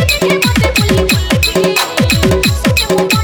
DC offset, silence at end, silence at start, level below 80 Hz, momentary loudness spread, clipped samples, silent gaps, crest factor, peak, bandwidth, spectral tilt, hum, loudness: under 0.1%; 0 s; 0 s; -22 dBFS; 1 LU; under 0.1%; none; 12 dB; 0 dBFS; over 20 kHz; -4.5 dB/octave; none; -11 LUFS